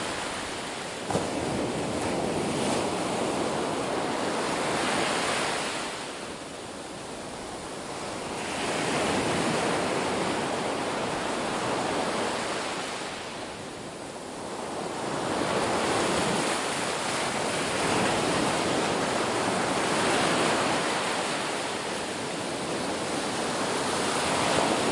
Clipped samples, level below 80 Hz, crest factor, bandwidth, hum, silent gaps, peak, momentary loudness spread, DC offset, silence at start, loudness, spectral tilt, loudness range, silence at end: under 0.1%; -58 dBFS; 20 dB; 11.5 kHz; none; none; -10 dBFS; 11 LU; under 0.1%; 0 s; -28 LUFS; -3 dB/octave; 6 LU; 0 s